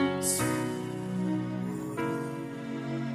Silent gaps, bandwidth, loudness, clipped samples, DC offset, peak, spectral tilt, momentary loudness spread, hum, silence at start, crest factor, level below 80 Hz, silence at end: none; 15.5 kHz; -32 LUFS; under 0.1%; under 0.1%; -16 dBFS; -5 dB/octave; 9 LU; none; 0 s; 16 dB; -64 dBFS; 0 s